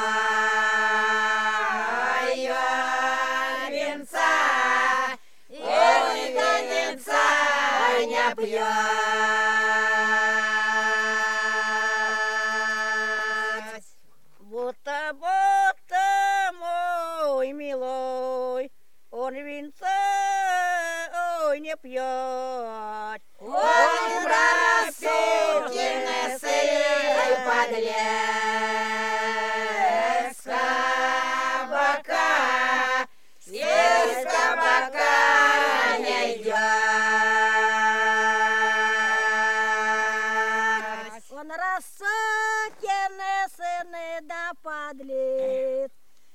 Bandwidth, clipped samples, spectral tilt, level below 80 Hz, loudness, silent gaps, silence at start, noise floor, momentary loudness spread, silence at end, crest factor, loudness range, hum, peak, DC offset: 16 kHz; under 0.1%; -0.5 dB/octave; -80 dBFS; -23 LUFS; none; 0 s; -63 dBFS; 12 LU; 0.5 s; 18 dB; 7 LU; none; -6 dBFS; 0.5%